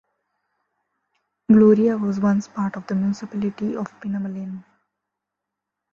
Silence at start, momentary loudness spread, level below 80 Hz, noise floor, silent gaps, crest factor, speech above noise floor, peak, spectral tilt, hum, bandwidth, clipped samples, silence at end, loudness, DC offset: 1.5 s; 17 LU; -60 dBFS; -83 dBFS; none; 18 dB; 64 dB; -6 dBFS; -8.5 dB/octave; 50 Hz at -40 dBFS; 7.4 kHz; under 0.1%; 1.3 s; -21 LUFS; under 0.1%